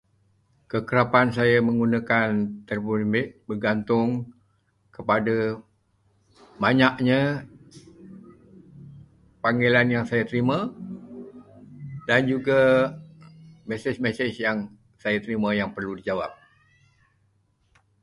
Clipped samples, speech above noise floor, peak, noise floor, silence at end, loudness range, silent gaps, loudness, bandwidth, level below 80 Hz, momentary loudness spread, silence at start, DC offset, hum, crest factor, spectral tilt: under 0.1%; 44 dB; -4 dBFS; -67 dBFS; 1.7 s; 5 LU; none; -23 LUFS; 11.5 kHz; -58 dBFS; 17 LU; 0.75 s; under 0.1%; none; 22 dB; -7.5 dB/octave